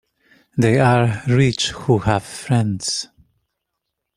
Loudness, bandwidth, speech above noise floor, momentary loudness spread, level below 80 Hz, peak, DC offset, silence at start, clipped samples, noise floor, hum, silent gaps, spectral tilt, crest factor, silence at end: -18 LUFS; 12.5 kHz; 61 dB; 9 LU; -48 dBFS; -2 dBFS; under 0.1%; 0.55 s; under 0.1%; -78 dBFS; none; none; -5.5 dB/octave; 18 dB; 1.1 s